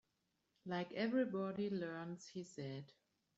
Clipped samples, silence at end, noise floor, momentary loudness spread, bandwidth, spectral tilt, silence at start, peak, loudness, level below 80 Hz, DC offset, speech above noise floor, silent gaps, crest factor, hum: under 0.1%; 0.45 s; -85 dBFS; 13 LU; 8 kHz; -5.5 dB/octave; 0.65 s; -28 dBFS; -43 LUFS; -84 dBFS; under 0.1%; 43 dB; none; 18 dB; none